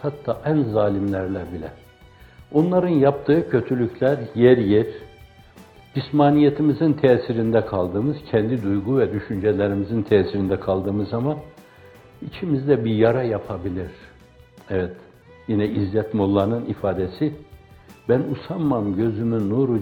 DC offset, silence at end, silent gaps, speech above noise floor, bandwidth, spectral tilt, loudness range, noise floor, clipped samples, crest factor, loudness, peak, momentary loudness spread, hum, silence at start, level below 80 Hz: under 0.1%; 0 s; none; 28 dB; 5.4 kHz; -9.5 dB/octave; 5 LU; -49 dBFS; under 0.1%; 20 dB; -21 LUFS; -2 dBFS; 12 LU; none; 0 s; -52 dBFS